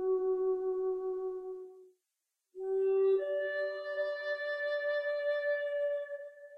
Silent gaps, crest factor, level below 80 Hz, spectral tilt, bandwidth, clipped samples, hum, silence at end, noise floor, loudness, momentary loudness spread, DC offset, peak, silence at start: none; 12 dB; -78 dBFS; -4 dB/octave; 5.6 kHz; under 0.1%; none; 0 s; -87 dBFS; -34 LUFS; 13 LU; under 0.1%; -22 dBFS; 0 s